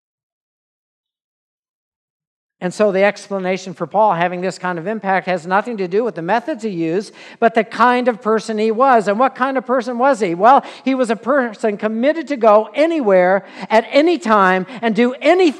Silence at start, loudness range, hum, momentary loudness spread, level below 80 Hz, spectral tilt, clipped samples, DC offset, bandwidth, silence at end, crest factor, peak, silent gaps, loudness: 2.6 s; 5 LU; none; 9 LU; -74 dBFS; -5.5 dB/octave; under 0.1%; under 0.1%; 11 kHz; 0 s; 16 dB; 0 dBFS; none; -16 LUFS